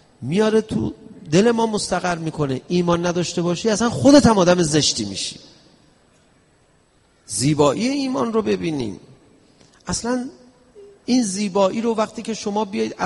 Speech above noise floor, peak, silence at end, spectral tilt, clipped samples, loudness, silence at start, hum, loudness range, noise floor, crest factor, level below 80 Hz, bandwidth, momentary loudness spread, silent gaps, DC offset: 39 dB; 0 dBFS; 0 s; -5 dB/octave; under 0.1%; -19 LUFS; 0.2 s; none; 7 LU; -58 dBFS; 20 dB; -48 dBFS; 11.5 kHz; 11 LU; none; under 0.1%